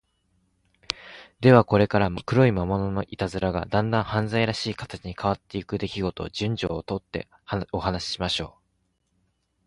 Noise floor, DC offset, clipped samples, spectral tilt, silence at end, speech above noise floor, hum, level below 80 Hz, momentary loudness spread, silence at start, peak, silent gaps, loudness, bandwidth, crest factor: -72 dBFS; under 0.1%; under 0.1%; -6.5 dB/octave; 1.2 s; 48 dB; none; -46 dBFS; 13 LU; 0.9 s; -2 dBFS; none; -25 LUFS; 11.5 kHz; 24 dB